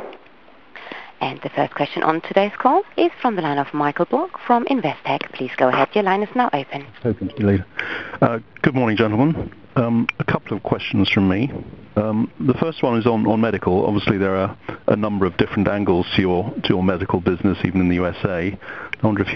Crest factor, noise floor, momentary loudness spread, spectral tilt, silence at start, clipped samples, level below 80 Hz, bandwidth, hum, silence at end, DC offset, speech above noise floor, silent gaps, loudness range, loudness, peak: 20 dB; -49 dBFS; 8 LU; -8.5 dB/octave; 0 s; under 0.1%; -50 dBFS; 6.4 kHz; none; 0 s; 0.4%; 29 dB; none; 1 LU; -20 LUFS; 0 dBFS